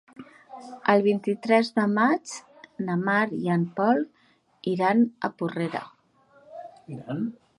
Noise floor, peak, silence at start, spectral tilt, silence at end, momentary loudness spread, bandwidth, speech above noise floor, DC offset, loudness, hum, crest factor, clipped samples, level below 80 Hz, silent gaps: -60 dBFS; -6 dBFS; 0.2 s; -6.5 dB/octave; 0.25 s; 21 LU; 11.5 kHz; 36 dB; under 0.1%; -25 LUFS; none; 20 dB; under 0.1%; -74 dBFS; none